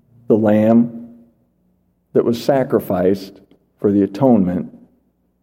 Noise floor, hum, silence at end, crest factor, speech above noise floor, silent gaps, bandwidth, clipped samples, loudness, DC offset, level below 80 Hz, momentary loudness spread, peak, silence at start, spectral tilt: -62 dBFS; none; 0.65 s; 18 dB; 47 dB; none; 16.5 kHz; under 0.1%; -16 LUFS; under 0.1%; -58 dBFS; 12 LU; 0 dBFS; 0.3 s; -8.5 dB/octave